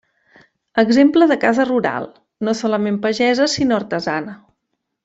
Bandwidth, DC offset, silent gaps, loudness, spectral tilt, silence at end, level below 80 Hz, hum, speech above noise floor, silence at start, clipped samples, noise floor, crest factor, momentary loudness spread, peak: 8 kHz; under 0.1%; none; -17 LUFS; -5 dB/octave; 0.7 s; -58 dBFS; none; 59 dB; 0.75 s; under 0.1%; -75 dBFS; 16 dB; 13 LU; -2 dBFS